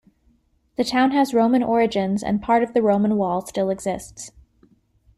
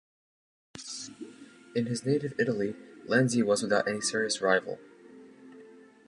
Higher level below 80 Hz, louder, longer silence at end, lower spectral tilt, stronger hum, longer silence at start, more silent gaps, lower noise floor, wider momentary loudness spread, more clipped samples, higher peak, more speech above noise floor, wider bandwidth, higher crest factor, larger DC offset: first, -54 dBFS vs -72 dBFS; first, -20 LUFS vs -29 LUFS; first, 0.9 s vs 0.3 s; about the same, -5.5 dB/octave vs -4.5 dB/octave; neither; about the same, 0.8 s vs 0.75 s; neither; first, -62 dBFS vs -53 dBFS; second, 14 LU vs 19 LU; neither; first, -6 dBFS vs -10 dBFS; first, 42 dB vs 25 dB; first, 14 kHz vs 11.5 kHz; second, 16 dB vs 22 dB; neither